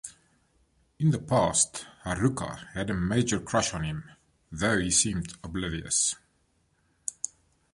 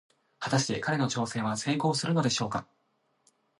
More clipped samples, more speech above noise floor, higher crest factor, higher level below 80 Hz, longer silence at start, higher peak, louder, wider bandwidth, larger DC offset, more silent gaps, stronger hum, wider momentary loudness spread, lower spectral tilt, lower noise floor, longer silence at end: neither; about the same, 42 dB vs 45 dB; about the same, 22 dB vs 18 dB; first, -50 dBFS vs -66 dBFS; second, 0.05 s vs 0.4 s; first, -8 dBFS vs -14 dBFS; about the same, -28 LUFS vs -29 LUFS; about the same, 11.5 kHz vs 11.5 kHz; neither; neither; neither; first, 14 LU vs 6 LU; about the same, -4 dB/octave vs -4.5 dB/octave; about the same, -70 dBFS vs -73 dBFS; second, 0.45 s vs 0.95 s